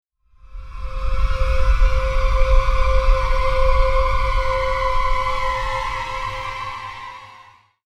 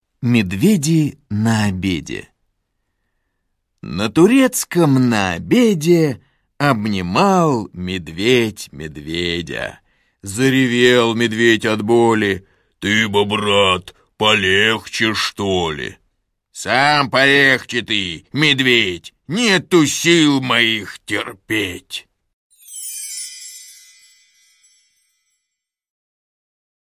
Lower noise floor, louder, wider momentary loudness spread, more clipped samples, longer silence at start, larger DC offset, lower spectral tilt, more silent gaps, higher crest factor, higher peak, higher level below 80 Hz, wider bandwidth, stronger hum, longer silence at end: second, -48 dBFS vs -80 dBFS; second, -22 LUFS vs -16 LUFS; about the same, 14 LU vs 16 LU; neither; first, 0.5 s vs 0.2 s; neither; about the same, -5 dB/octave vs -4.5 dB/octave; second, none vs 22.33-22.50 s; about the same, 16 dB vs 18 dB; about the same, -2 dBFS vs 0 dBFS; first, -20 dBFS vs -46 dBFS; second, 9.2 kHz vs 16 kHz; neither; second, 0.55 s vs 3.2 s